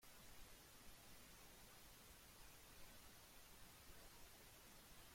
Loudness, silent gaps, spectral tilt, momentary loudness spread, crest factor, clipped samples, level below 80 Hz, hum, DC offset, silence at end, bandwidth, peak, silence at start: -63 LUFS; none; -2.5 dB/octave; 1 LU; 14 dB; under 0.1%; -72 dBFS; none; under 0.1%; 0 s; 16.5 kHz; -48 dBFS; 0 s